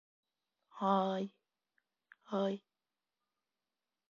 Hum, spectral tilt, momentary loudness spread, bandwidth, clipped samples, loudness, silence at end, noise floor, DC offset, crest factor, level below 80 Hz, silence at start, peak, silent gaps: none; -5.5 dB/octave; 12 LU; 7.2 kHz; under 0.1%; -37 LUFS; 1.55 s; under -90 dBFS; under 0.1%; 22 dB; -90 dBFS; 0.75 s; -18 dBFS; none